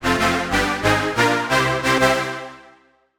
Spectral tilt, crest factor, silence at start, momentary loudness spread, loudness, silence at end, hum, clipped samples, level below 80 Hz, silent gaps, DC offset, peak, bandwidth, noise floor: -4 dB/octave; 18 dB; 0 s; 9 LU; -18 LUFS; 0.55 s; none; under 0.1%; -40 dBFS; none; under 0.1%; -4 dBFS; over 20 kHz; -54 dBFS